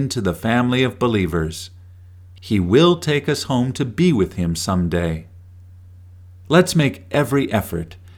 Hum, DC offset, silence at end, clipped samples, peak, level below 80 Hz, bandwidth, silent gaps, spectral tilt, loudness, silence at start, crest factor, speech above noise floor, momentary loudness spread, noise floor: none; under 0.1%; 0.05 s; under 0.1%; 0 dBFS; -42 dBFS; 18 kHz; none; -6 dB/octave; -19 LUFS; 0 s; 18 dB; 24 dB; 12 LU; -42 dBFS